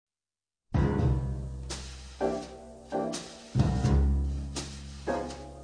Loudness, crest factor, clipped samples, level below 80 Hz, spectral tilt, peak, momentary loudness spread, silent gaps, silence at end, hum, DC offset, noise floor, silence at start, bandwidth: -31 LUFS; 18 dB; under 0.1%; -34 dBFS; -6.5 dB/octave; -12 dBFS; 13 LU; none; 0 s; none; under 0.1%; under -90 dBFS; 0.7 s; 10 kHz